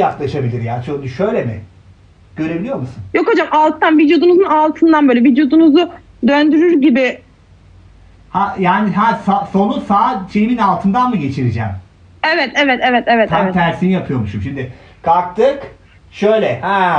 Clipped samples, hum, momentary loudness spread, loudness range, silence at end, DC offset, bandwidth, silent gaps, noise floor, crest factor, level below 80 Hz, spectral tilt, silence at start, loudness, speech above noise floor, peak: under 0.1%; none; 12 LU; 5 LU; 0 s; under 0.1%; 7.6 kHz; none; -44 dBFS; 12 dB; -42 dBFS; -7.5 dB/octave; 0 s; -14 LUFS; 31 dB; -2 dBFS